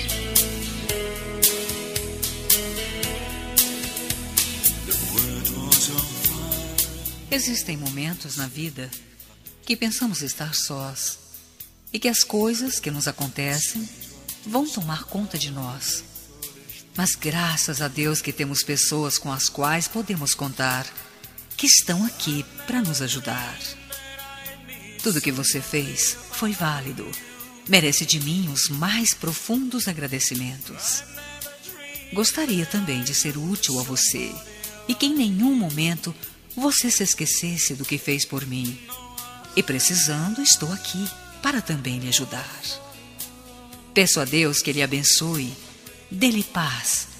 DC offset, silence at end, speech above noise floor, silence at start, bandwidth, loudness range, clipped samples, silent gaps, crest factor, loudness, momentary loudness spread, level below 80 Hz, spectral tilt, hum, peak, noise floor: under 0.1%; 0 s; 22 dB; 0 s; 16 kHz; 6 LU; under 0.1%; none; 24 dB; -22 LUFS; 17 LU; -46 dBFS; -2.5 dB/octave; none; 0 dBFS; -46 dBFS